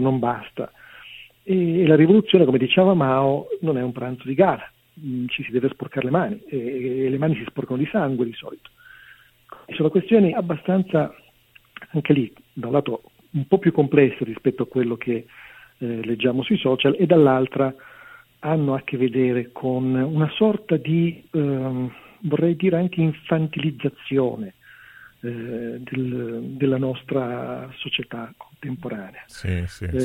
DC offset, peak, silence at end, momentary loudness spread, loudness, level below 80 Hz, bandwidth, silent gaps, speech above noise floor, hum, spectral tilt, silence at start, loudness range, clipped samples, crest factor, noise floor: under 0.1%; 0 dBFS; 0 s; 16 LU; -22 LUFS; -54 dBFS; 15.5 kHz; none; 34 dB; none; -8.5 dB/octave; 0 s; 8 LU; under 0.1%; 22 dB; -55 dBFS